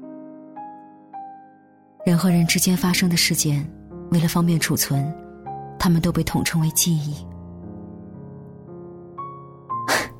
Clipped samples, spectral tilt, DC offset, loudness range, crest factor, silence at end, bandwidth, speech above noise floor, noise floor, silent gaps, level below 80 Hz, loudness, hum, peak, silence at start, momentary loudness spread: under 0.1%; -4.5 dB/octave; under 0.1%; 6 LU; 18 dB; 0 s; 16.5 kHz; 32 dB; -52 dBFS; none; -46 dBFS; -20 LUFS; none; -6 dBFS; 0 s; 22 LU